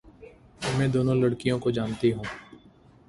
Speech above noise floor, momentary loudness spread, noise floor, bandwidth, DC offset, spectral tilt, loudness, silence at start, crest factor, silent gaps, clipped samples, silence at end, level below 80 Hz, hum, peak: 30 dB; 11 LU; -55 dBFS; 11.5 kHz; under 0.1%; -7 dB/octave; -26 LUFS; 0.05 s; 16 dB; none; under 0.1%; 0.5 s; -54 dBFS; none; -10 dBFS